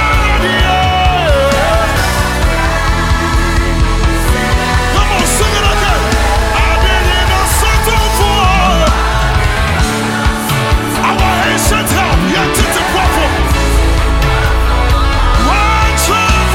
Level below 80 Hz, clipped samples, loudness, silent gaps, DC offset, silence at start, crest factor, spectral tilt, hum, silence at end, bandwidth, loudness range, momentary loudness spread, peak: -14 dBFS; under 0.1%; -11 LUFS; none; under 0.1%; 0 s; 10 dB; -4 dB/octave; none; 0 s; 16.5 kHz; 1 LU; 3 LU; 0 dBFS